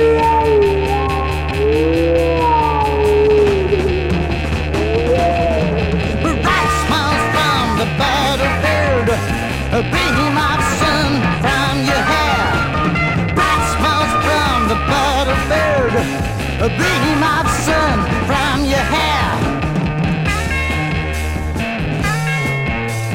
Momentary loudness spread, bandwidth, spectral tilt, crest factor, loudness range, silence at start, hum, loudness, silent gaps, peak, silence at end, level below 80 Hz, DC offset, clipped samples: 4 LU; 16.5 kHz; -5 dB/octave; 14 dB; 2 LU; 0 s; none; -15 LUFS; none; -2 dBFS; 0 s; -26 dBFS; under 0.1%; under 0.1%